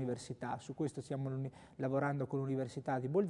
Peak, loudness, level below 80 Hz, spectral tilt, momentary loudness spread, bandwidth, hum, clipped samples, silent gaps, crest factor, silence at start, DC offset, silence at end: -22 dBFS; -39 LUFS; -74 dBFS; -7.5 dB/octave; 7 LU; 11 kHz; none; under 0.1%; none; 18 dB; 0 s; under 0.1%; 0 s